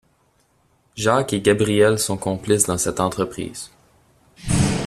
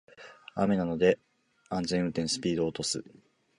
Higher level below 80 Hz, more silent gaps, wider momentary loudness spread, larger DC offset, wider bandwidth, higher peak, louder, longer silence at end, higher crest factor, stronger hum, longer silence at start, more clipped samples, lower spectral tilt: first, -42 dBFS vs -60 dBFS; neither; first, 17 LU vs 10 LU; neither; first, 14.5 kHz vs 11.5 kHz; first, -2 dBFS vs -10 dBFS; first, -20 LUFS vs -30 LUFS; second, 0 s vs 0.55 s; about the same, 20 dB vs 22 dB; neither; first, 0.95 s vs 0.2 s; neither; about the same, -4.5 dB/octave vs -5 dB/octave